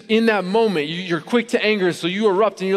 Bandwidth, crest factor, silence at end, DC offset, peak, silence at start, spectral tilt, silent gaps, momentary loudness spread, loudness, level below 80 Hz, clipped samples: 13 kHz; 16 dB; 0 s; under 0.1%; -4 dBFS; 0.1 s; -5.5 dB/octave; none; 5 LU; -19 LUFS; -66 dBFS; under 0.1%